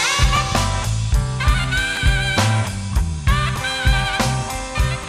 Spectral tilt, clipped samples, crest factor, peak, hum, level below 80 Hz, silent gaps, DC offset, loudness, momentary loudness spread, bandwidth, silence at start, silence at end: -4 dB/octave; under 0.1%; 16 dB; -4 dBFS; none; -22 dBFS; none; under 0.1%; -19 LUFS; 5 LU; 15 kHz; 0 s; 0 s